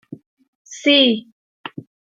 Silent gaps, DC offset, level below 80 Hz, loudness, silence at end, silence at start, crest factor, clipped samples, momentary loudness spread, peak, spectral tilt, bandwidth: 0.26-0.37 s, 0.48-0.65 s, 1.32-1.64 s; under 0.1%; -76 dBFS; -15 LUFS; 0.5 s; 0.1 s; 20 dB; under 0.1%; 24 LU; -2 dBFS; -3.5 dB/octave; 7.8 kHz